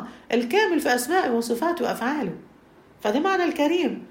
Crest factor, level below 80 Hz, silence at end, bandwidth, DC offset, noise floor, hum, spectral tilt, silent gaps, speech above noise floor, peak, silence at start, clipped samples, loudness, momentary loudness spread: 16 dB; -64 dBFS; 0.05 s; 16.5 kHz; under 0.1%; -52 dBFS; none; -4 dB/octave; none; 29 dB; -8 dBFS; 0 s; under 0.1%; -23 LUFS; 7 LU